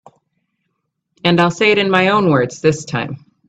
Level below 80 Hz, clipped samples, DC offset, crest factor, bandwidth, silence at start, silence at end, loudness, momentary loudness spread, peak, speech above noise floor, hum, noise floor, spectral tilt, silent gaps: -54 dBFS; under 0.1%; under 0.1%; 16 dB; 9 kHz; 1.25 s; 0.3 s; -15 LUFS; 10 LU; 0 dBFS; 57 dB; none; -72 dBFS; -5.5 dB/octave; none